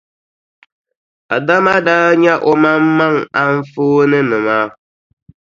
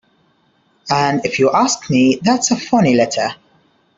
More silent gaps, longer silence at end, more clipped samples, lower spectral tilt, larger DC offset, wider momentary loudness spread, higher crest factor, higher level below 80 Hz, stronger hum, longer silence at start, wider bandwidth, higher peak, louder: neither; about the same, 0.7 s vs 0.65 s; neither; first, -7 dB/octave vs -4.5 dB/octave; neither; about the same, 6 LU vs 7 LU; about the same, 14 dB vs 14 dB; about the same, -58 dBFS vs -56 dBFS; neither; first, 1.3 s vs 0.85 s; about the same, 7.4 kHz vs 7.8 kHz; about the same, 0 dBFS vs -2 dBFS; about the same, -13 LUFS vs -15 LUFS